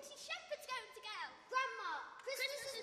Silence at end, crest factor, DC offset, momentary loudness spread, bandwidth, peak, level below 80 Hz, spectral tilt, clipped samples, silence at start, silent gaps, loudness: 0 s; 18 dB; under 0.1%; 7 LU; 15 kHz; -26 dBFS; -86 dBFS; 0.5 dB/octave; under 0.1%; 0 s; none; -44 LUFS